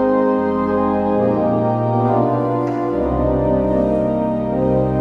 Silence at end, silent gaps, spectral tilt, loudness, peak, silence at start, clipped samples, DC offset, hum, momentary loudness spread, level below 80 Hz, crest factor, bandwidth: 0 s; none; -10.5 dB/octave; -17 LUFS; -4 dBFS; 0 s; under 0.1%; under 0.1%; none; 3 LU; -34 dBFS; 12 dB; 6.4 kHz